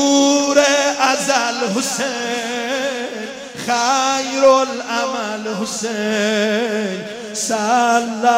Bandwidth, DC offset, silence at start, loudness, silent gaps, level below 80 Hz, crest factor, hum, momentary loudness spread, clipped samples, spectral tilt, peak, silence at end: 16 kHz; under 0.1%; 0 s; -17 LUFS; none; -64 dBFS; 16 dB; none; 10 LU; under 0.1%; -2.5 dB/octave; -2 dBFS; 0 s